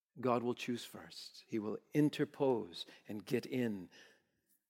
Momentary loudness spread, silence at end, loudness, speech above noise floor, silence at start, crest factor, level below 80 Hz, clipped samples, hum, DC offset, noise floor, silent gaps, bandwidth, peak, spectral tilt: 14 LU; 0.65 s; -38 LUFS; 41 dB; 0.15 s; 20 dB; under -90 dBFS; under 0.1%; none; under 0.1%; -79 dBFS; none; 16.5 kHz; -20 dBFS; -6 dB/octave